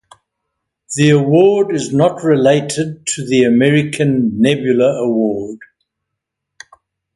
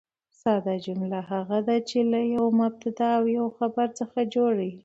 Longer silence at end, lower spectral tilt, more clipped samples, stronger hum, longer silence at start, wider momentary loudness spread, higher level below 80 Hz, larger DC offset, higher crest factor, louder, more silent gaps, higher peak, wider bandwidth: first, 1.6 s vs 0.05 s; about the same, -6 dB/octave vs -7 dB/octave; neither; neither; first, 0.9 s vs 0.45 s; first, 10 LU vs 7 LU; first, -54 dBFS vs -70 dBFS; neither; about the same, 14 dB vs 14 dB; first, -14 LUFS vs -26 LUFS; neither; first, 0 dBFS vs -10 dBFS; first, 11.5 kHz vs 8 kHz